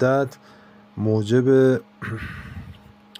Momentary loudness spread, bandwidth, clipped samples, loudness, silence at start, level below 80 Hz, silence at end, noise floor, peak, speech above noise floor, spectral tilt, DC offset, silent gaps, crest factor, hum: 21 LU; 9.8 kHz; under 0.1%; -21 LUFS; 0 s; -52 dBFS; 0.45 s; -45 dBFS; -6 dBFS; 25 dB; -8 dB/octave; under 0.1%; none; 16 dB; none